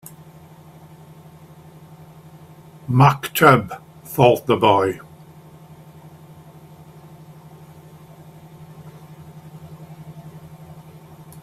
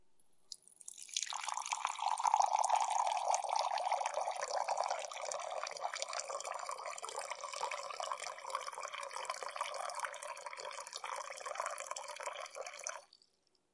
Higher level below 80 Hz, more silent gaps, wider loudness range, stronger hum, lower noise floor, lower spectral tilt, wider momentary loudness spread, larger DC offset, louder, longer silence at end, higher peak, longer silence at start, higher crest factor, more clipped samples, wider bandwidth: first, -56 dBFS vs under -90 dBFS; neither; first, 24 LU vs 8 LU; neither; second, -44 dBFS vs -77 dBFS; first, -6 dB/octave vs 2.5 dB/octave; first, 28 LU vs 12 LU; neither; first, -16 LUFS vs -39 LUFS; about the same, 0.65 s vs 0.7 s; first, 0 dBFS vs -16 dBFS; first, 2.9 s vs 0 s; about the same, 24 dB vs 24 dB; neither; first, 16 kHz vs 11.5 kHz